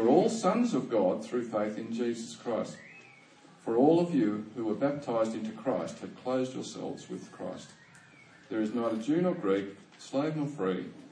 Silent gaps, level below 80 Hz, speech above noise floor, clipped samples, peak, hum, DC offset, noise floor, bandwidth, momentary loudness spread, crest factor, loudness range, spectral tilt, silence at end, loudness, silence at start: none; -82 dBFS; 26 dB; under 0.1%; -12 dBFS; none; under 0.1%; -57 dBFS; 10.5 kHz; 15 LU; 20 dB; 6 LU; -6.5 dB/octave; 0 s; -31 LUFS; 0 s